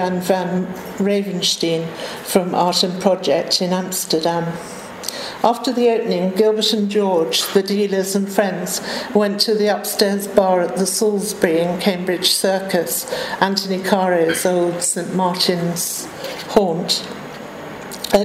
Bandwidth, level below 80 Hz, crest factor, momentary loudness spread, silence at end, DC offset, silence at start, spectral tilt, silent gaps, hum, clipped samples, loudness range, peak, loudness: 16 kHz; -56 dBFS; 18 dB; 10 LU; 0 s; under 0.1%; 0 s; -3.5 dB/octave; none; none; under 0.1%; 2 LU; 0 dBFS; -18 LUFS